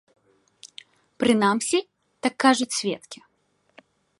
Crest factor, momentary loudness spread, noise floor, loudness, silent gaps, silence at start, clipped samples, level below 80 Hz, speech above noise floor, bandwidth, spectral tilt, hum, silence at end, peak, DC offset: 22 dB; 24 LU; -69 dBFS; -23 LUFS; none; 0.65 s; under 0.1%; -70 dBFS; 46 dB; 11.5 kHz; -3.5 dB/octave; none; 1.05 s; -4 dBFS; under 0.1%